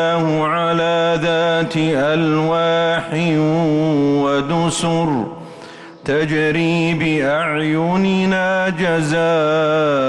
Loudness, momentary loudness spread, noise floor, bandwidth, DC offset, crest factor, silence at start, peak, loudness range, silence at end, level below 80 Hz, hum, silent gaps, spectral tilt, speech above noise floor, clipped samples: -16 LUFS; 3 LU; -36 dBFS; 11.5 kHz; under 0.1%; 8 dB; 0 s; -8 dBFS; 2 LU; 0 s; -50 dBFS; none; none; -6 dB/octave; 20 dB; under 0.1%